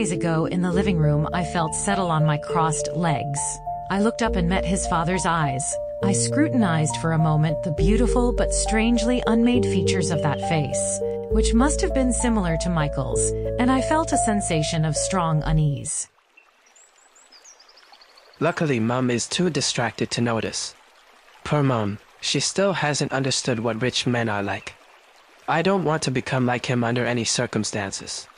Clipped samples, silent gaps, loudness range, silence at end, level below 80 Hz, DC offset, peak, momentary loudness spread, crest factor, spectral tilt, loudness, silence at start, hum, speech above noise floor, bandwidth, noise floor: under 0.1%; none; 4 LU; 0.15 s; -34 dBFS; under 0.1%; -6 dBFS; 6 LU; 18 dB; -5 dB/octave; -22 LUFS; 0 s; none; 35 dB; 10.5 kHz; -57 dBFS